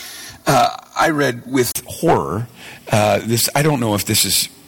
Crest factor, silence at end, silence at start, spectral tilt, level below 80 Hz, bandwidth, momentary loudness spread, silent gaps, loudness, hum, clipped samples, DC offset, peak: 14 dB; 0.2 s; 0 s; -3.5 dB/octave; -46 dBFS; 17.5 kHz; 9 LU; none; -17 LUFS; none; under 0.1%; under 0.1%; -4 dBFS